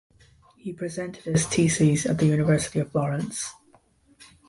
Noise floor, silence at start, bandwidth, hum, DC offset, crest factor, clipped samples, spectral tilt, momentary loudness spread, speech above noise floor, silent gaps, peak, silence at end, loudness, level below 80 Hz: -60 dBFS; 0.65 s; 11.5 kHz; none; under 0.1%; 16 dB; under 0.1%; -5.5 dB/octave; 13 LU; 36 dB; none; -8 dBFS; 0.95 s; -24 LUFS; -54 dBFS